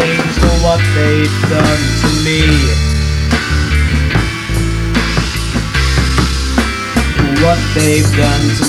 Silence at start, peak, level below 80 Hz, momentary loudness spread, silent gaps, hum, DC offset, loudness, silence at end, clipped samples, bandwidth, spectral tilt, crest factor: 0 s; 0 dBFS; -18 dBFS; 4 LU; none; none; under 0.1%; -12 LUFS; 0 s; under 0.1%; 15 kHz; -5 dB/octave; 12 dB